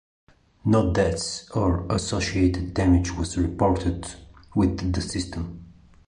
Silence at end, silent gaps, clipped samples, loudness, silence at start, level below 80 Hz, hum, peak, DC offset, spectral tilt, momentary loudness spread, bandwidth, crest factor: 0.35 s; none; under 0.1%; -24 LUFS; 0.65 s; -34 dBFS; none; -6 dBFS; under 0.1%; -6 dB/octave; 11 LU; 11 kHz; 18 dB